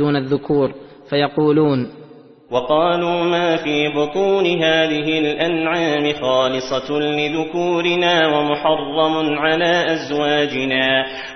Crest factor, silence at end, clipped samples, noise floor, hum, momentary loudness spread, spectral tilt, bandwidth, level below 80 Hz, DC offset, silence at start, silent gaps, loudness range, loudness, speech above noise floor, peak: 14 dB; 0 s; under 0.1%; -42 dBFS; none; 5 LU; -5.5 dB/octave; 6.4 kHz; -54 dBFS; under 0.1%; 0 s; none; 2 LU; -17 LUFS; 25 dB; -2 dBFS